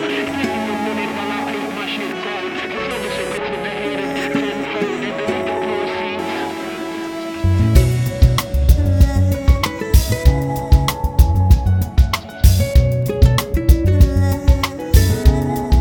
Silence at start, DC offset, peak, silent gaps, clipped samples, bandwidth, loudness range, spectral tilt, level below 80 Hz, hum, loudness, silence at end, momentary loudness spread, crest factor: 0 s; under 0.1%; 0 dBFS; none; under 0.1%; 19 kHz; 7 LU; -6 dB/octave; -18 dBFS; none; -17 LUFS; 0 s; 9 LU; 16 dB